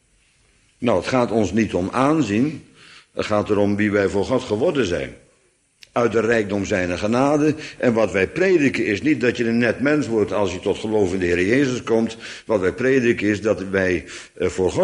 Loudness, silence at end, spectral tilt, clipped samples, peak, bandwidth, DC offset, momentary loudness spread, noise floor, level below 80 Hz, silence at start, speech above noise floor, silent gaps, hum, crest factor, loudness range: -20 LUFS; 0 s; -6 dB/octave; under 0.1%; -4 dBFS; 11 kHz; under 0.1%; 7 LU; -61 dBFS; -50 dBFS; 0.8 s; 42 dB; none; none; 16 dB; 3 LU